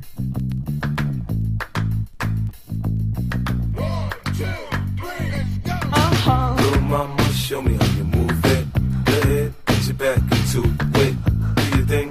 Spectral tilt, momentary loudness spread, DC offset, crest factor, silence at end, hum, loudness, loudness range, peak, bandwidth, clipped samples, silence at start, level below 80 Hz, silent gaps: -6 dB/octave; 7 LU; under 0.1%; 16 dB; 0 s; none; -21 LUFS; 5 LU; -4 dBFS; 15.5 kHz; under 0.1%; 0 s; -28 dBFS; none